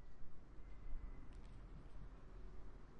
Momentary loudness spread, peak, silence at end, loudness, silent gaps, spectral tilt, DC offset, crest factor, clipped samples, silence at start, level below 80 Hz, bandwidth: 6 LU; -34 dBFS; 0 s; -60 LUFS; none; -7.5 dB/octave; under 0.1%; 14 dB; under 0.1%; 0 s; -54 dBFS; 5.8 kHz